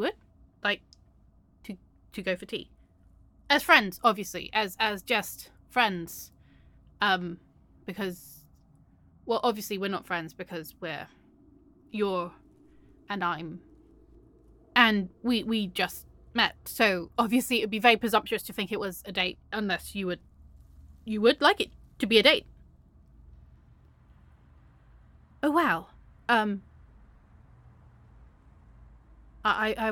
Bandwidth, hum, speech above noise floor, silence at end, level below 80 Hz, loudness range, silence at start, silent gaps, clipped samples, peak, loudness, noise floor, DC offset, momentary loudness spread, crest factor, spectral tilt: 17.5 kHz; none; 33 dB; 0 s; -58 dBFS; 9 LU; 0 s; none; under 0.1%; -4 dBFS; -27 LUFS; -60 dBFS; under 0.1%; 19 LU; 26 dB; -3.5 dB/octave